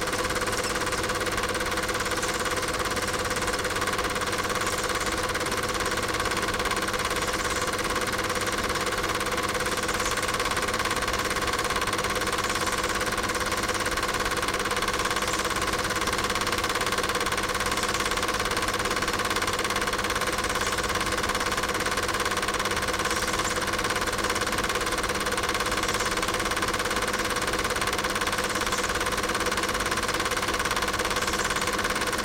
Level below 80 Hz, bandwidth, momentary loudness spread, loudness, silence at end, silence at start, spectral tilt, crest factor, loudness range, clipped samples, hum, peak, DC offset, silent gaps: -42 dBFS; 17 kHz; 1 LU; -26 LUFS; 0 s; 0 s; -2 dB/octave; 18 dB; 1 LU; under 0.1%; none; -10 dBFS; under 0.1%; none